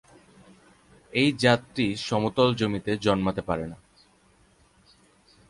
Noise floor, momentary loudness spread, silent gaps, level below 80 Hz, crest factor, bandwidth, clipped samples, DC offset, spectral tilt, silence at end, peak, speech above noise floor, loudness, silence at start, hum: -61 dBFS; 9 LU; none; -54 dBFS; 22 dB; 11.5 kHz; under 0.1%; under 0.1%; -5.5 dB/octave; 1.75 s; -6 dBFS; 36 dB; -25 LUFS; 1.15 s; none